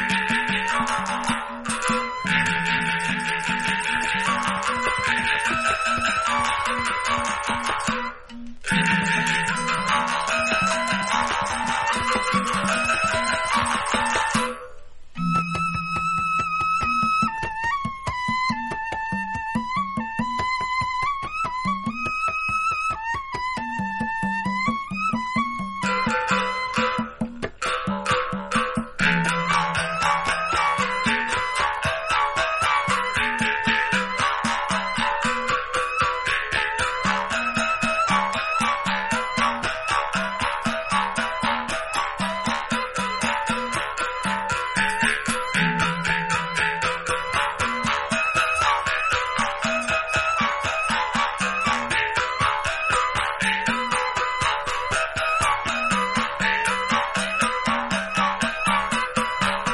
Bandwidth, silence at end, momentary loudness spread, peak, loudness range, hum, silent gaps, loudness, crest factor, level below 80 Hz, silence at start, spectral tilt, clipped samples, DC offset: 11.5 kHz; 0 s; 5 LU; -6 dBFS; 3 LU; none; none; -23 LUFS; 18 dB; -46 dBFS; 0 s; -3 dB/octave; under 0.1%; under 0.1%